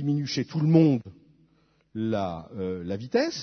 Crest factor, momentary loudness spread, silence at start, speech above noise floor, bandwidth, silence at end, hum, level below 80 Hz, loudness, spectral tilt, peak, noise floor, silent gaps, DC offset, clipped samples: 18 dB; 13 LU; 0 s; 40 dB; 6.4 kHz; 0 s; none; -62 dBFS; -26 LUFS; -7 dB/octave; -8 dBFS; -65 dBFS; none; under 0.1%; under 0.1%